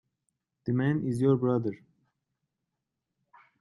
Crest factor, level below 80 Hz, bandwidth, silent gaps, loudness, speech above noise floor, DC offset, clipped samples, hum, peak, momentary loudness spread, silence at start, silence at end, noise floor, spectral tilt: 18 dB; -70 dBFS; 11.5 kHz; none; -28 LUFS; 58 dB; under 0.1%; under 0.1%; none; -14 dBFS; 13 LU; 0.65 s; 1.85 s; -85 dBFS; -9 dB/octave